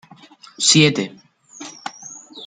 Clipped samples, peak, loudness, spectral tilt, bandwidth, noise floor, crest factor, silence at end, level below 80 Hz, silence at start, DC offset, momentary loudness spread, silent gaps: under 0.1%; -2 dBFS; -15 LUFS; -3 dB/octave; 9.6 kHz; -46 dBFS; 20 dB; 0 s; -62 dBFS; 0.6 s; under 0.1%; 24 LU; none